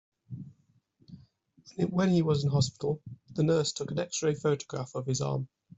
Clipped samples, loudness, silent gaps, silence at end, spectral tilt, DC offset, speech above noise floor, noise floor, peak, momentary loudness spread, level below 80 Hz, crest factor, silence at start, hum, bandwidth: under 0.1%; -30 LUFS; none; 0.3 s; -6 dB/octave; under 0.1%; 39 dB; -68 dBFS; -14 dBFS; 19 LU; -64 dBFS; 16 dB; 0.3 s; none; 8.2 kHz